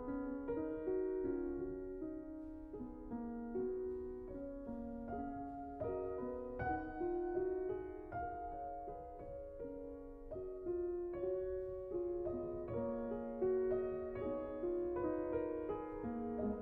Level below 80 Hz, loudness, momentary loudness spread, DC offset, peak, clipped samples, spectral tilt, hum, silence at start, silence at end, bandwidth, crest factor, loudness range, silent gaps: -58 dBFS; -43 LUFS; 9 LU; under 0.1%; -26 dBFS; under 0.1%; -9 dB/octave; none; 0 s; 0 s; 3.4 kHz; 16 dB; 5 LU; none